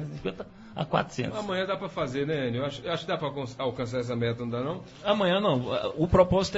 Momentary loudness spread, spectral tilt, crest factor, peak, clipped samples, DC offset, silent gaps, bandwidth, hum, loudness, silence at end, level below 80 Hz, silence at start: 11 LU; -6 dB/octave; 20 dB; -8 dBFS; under 0.1%; under 0.1%; none; 8 kHz; none; -29 LUFS; 0 s; -48 dBFS; 0 s